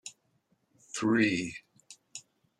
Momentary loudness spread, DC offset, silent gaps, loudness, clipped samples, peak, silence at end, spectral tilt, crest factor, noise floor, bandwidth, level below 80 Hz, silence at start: 21 LU; under 0.1%; none; -30 LUFS; under 0.1%; -14 dBFS; 0.4 s; -4.5 dB/octave; 20 dB; -73 dBFS; 11.5 kHz; -72 dBFS; 0.05 s